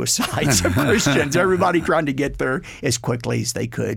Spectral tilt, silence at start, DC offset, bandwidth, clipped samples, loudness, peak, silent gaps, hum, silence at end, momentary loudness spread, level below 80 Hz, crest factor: -4 dB/octave; 0 s; under 0.1%; 17 kHz; under 0.1%; -19 LUFS; -6 dBFS; none; none; 0 s; 7 LU; -42 dBFS; 14 dB